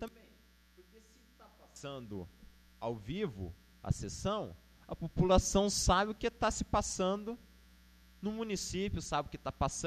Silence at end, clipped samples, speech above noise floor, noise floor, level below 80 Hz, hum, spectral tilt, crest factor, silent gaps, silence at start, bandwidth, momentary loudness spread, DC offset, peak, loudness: 0 s; under 0.1%; 29 dB; -64 dBFS; -46 dBFS; none; -4.5 dB/octave; 22 dB; none; 0 s; 14 kHz; 18 LU; under 0.1%; -14 dBFS; -35 LUFS